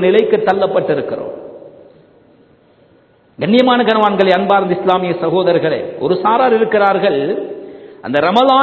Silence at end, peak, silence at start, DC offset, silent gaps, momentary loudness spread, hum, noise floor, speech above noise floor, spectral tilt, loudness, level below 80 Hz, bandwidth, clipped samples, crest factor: 0 s; 0 dBFS; 0 s; under 0.1%; none; 14 LU; none; -50 dBFS; 38 dB; -7.5 dB/octave; -13 LUFS; -58 dBFS; 8 kHz; under 0.1%; 14 dB